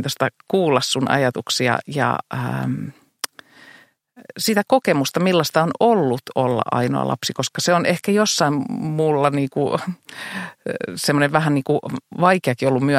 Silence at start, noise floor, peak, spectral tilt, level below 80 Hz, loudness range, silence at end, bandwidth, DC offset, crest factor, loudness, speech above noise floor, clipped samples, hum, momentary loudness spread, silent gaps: 0 s; -50 dBFS; 0 dBFS; -5 dB/octave; -62 dBFS; 4 LU; 0 s; 16.5 kHz; under 0.1%; 20 dB; -20 LUFS; 30 dB; under 0.1%; none; 12 LU; none